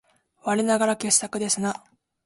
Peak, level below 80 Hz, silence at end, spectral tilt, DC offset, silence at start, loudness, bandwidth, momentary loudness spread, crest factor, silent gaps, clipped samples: -4 dBFS; -68 dBFS; 0.5 s; -3 dB/octave; under 0.1%; 0.45 s; -23 LUFS; 11.5 kHz; 11 LU; 22 dB; none; under 0.1%